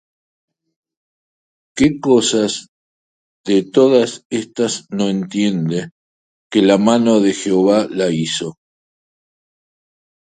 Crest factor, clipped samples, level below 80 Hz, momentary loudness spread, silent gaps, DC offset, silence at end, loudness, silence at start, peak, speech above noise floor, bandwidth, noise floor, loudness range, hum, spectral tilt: 18 dB; under 0.1%; -56 dBFS; 11 LU; 2.68-3.44 s, 4.25-4.30 s, 5.92-6.50 s; under 0.1%; 1.75 s; -16 LUFS; 1.75 s; 0 dBFS; over 75 dB; 9.6 kHz; under -90 dBFS; 3 LU; none; -5 dB/octave